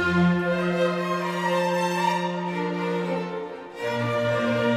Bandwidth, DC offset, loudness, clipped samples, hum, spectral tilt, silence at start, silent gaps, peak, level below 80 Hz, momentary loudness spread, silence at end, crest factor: 14.5 kHz; under 0.1%; -25 LUFS; under 0.1%; none; -6 dB/octave; 0 s; none; -10 dBFS; -56 dBFS; 7 LU; 0 s; 14 dB